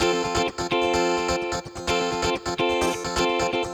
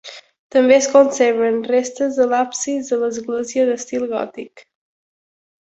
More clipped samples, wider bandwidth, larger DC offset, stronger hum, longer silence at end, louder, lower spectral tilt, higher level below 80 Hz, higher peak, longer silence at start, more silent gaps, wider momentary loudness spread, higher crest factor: neither; first, over 20 kHz vs 8.2 kHz; neither; neither; second, 0 s vs 1.15 s; second, -24 LUFS vs -17 LUFS; about the same, -3.5 dB/octave vs -3 dB/octave; first, -44 dBFS vs -64 dBFS; second, -8 dBFS vs -2 dBFS; about the same, 0 s vs 0.05 s; second, none vs 0.39-0.50 s; second, 4 LU vs 12 LU; about the same, 16 dB vs 18 dB